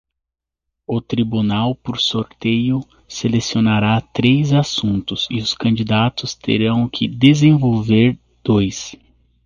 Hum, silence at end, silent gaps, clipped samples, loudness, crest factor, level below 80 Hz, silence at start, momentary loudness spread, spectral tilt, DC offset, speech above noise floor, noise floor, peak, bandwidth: none; 0.5 s; none; under 0.1%; -17 LUFS; 18 dB; -46 dBFS; 0.9 s; 10 LU; -6 dB/octave; under 0.1%; 67 dB; -83 dBFS; 0 dBFS; 7.4 kHz